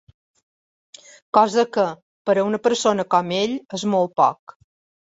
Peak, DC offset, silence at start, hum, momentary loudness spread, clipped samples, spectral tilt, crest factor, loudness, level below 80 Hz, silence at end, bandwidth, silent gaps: -2 dBFS; under 0.1%; 1.35 s; none; 7 LU; under 0.1%; -4.5 dB/octave; 20 dB; -20 LUFS; -66 dBFS; 0.7 s; 8 kHz; 2.02-2.25 s